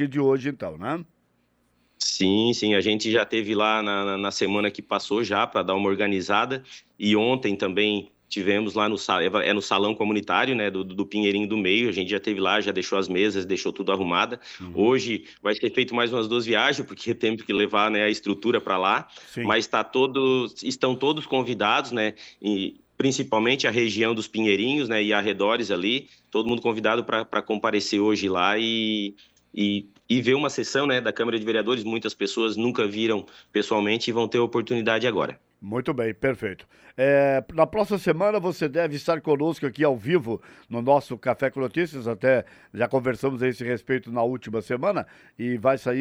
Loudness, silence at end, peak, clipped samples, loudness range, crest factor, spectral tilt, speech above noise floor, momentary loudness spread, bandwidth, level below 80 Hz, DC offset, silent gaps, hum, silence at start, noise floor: -24 LUFS; 0 s; -6 dBFS; under 0.1%; 2 LU; 18 dB; -4.5 dB/octave; 43 dB; 8 LU; 14 kHz; -64 dBFS; under 0.1%; none; none; 0 s; -67 dBFS